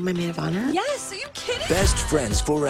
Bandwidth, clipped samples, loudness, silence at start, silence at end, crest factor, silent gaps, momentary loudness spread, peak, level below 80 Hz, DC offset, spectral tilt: 16 kHz; under 0.1%; -24 LUFS; 0 s; 0 s; 16 dB; none; 8 LU; -6 dBFS; -32 dBFS; under 0.1%; -4.5 dB/octave